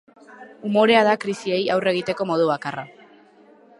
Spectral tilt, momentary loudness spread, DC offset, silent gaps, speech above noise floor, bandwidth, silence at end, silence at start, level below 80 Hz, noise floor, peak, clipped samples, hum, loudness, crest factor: -5.5 dB/octave; 16 LU; under 0.1%; none; 31 dB; 11.5 kHz; 0.9 s; 0.3 s; -70 dBFS; -51 dBFS; -2 dBFS; under 0.1%; none; -20 LUFS; 20 dB